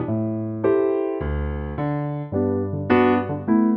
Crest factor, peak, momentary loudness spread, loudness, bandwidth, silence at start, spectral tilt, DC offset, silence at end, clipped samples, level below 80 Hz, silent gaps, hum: 16 dB; -4 dBFS; 8 LU; -22 LUFS; 5.2 kHz; 0 s; -11 dB/octave; under 0.1%; 0 s; under 0.1%; -36 dBFS; none; none